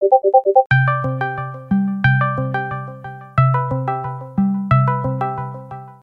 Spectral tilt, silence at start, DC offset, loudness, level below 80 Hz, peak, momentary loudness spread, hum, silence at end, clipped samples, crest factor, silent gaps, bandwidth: -10 dB/octave; 0 s; under 0.1%; -18 LUFS; -46 dBFS; 0 dBFS; 14 LU; none; 0.1 s; under 0.1%; 16 dB; 0.66-0.70 s; 5 kHz